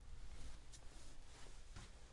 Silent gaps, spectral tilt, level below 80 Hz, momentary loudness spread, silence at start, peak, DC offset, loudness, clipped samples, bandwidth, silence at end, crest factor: none; -3.5 dB/octave; -56 dBFS; 3 LU; 0 s; -38 dBFS; under 0.1%; -60 LUFS; under 0.1%; 11.5 kHz; 0 s; 12 dB